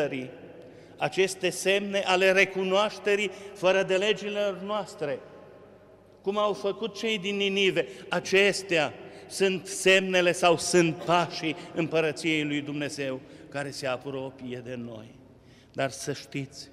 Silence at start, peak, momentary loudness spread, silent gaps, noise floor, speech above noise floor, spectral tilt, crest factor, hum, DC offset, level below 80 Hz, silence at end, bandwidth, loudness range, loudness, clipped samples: 0 s; -8 dBFS; 15 LU; none; -54 dBFS; 27 dB; -3.5 dB/octave; 20 dB; none; under 0.1%; -68 dBFS; 0 s; 14.5 kHz; 9 LU; -26 LUFS; under 0.1%